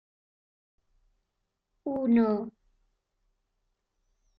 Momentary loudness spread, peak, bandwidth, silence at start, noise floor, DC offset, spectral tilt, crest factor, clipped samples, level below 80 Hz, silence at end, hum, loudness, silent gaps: 16 LU; -14 dBFS; 5 kHz; 1.85 s; -82 dBFS; under 0.1%; -10 dB/octave; 20 dB; under 0.1%; -68 dBFS; 1.9 s; none; -27 LUFS; none